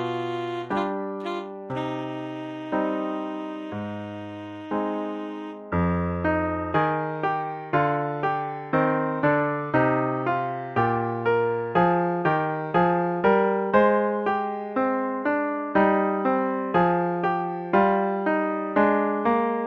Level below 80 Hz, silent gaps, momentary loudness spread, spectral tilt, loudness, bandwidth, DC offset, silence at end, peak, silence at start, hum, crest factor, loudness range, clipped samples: -54 dBFS; none; 11 LU; -9 dB/octave; -25 LUFS; 7 kHz; under 0.1%; 0 s; -6 dBFS; 0 s; none; 18 dB; 8 LU; under 0.1%